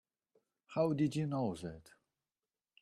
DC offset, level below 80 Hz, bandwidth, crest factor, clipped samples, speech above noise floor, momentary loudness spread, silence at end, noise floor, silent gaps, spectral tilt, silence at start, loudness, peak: under 0.1%; -72 dBFS; 12.5 kHz; 18 dB; under 0.1%; over 54 dB; 15 LU; 1 s; under -90 dBFS; none; -7.5 dB/octave; 0.7 s; -36 LUFS; -20 dBFS